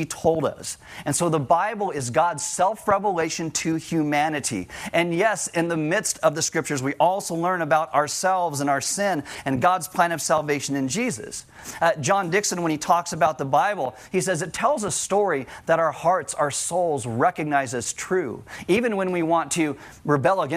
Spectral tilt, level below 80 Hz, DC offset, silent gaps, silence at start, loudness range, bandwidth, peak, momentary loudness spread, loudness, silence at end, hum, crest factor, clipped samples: -4 dB/octave; -58 dBFS; under 0.1%; none; 0 s; 1 LU; 16 kHz; -4 dBFS; 6 LU; -23 LUFS; 0 s; none; 18 dB; under 0.1%